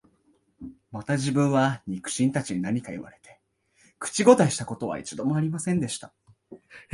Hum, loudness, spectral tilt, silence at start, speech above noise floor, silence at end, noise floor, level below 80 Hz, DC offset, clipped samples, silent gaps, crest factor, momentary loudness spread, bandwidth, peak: none; -25 LUFS; -5.5 dB/octave; 0.6 s; 41 dB; 0.1 s; -66 dBFS; -62 dBFS; under 0.1%; under 0.1%; none; 24 dB; 20 LU; 11.5 kHz; -2 dBFS